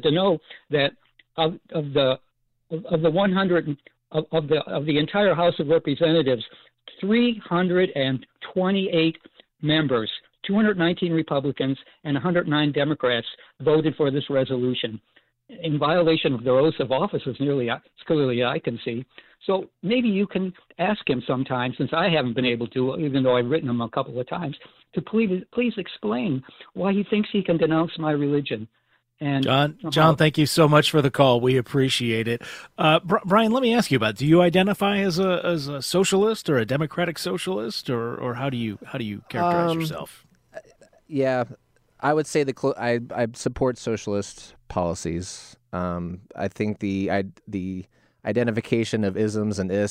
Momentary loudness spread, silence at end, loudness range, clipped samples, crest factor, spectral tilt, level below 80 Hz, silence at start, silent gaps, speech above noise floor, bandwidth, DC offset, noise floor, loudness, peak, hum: 12 LU; 0 s; 7 LU; under 0.1%; 22 dB; -6 dB/octave; -56 dBFS; 0.05 s; none; 28 dB; 16 kHz; under 0.1%; -50 dBFS; -23 LUFS; -2 dBFS; none